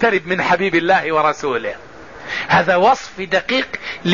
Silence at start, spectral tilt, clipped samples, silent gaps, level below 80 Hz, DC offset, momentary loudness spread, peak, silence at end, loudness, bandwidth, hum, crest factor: 0 s; -5 dB/octave; under 0.1%; none; -50 dBFS; 0.5%; 11 LU; -4 dBFS; 0 s; -17 LUFS; 7.4 kHz; none; 14 dB